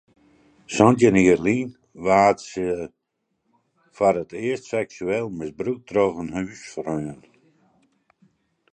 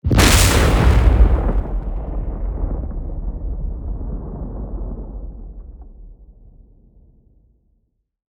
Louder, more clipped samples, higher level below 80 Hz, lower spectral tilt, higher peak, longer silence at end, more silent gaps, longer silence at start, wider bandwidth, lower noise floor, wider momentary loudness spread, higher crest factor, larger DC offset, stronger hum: second, -22 LUFS vs -19 LUFS; neither; second, -54 dBFS vs -20 dBFS; first, -6 dB/octave vs -4.5 dB/octave; about the same, -2 dBFS vs -2 dBFS; second, 1.6 s vs 2.05 s; neither; first, 0.7 s vs 0.05 s; second, 9.6 kHz vs over 20 kHz; first, -75 dBFS vs -65 dBFS; second, 15 LU vs 21 LU; about the same, 22 dB vs 18 dB; neither; neither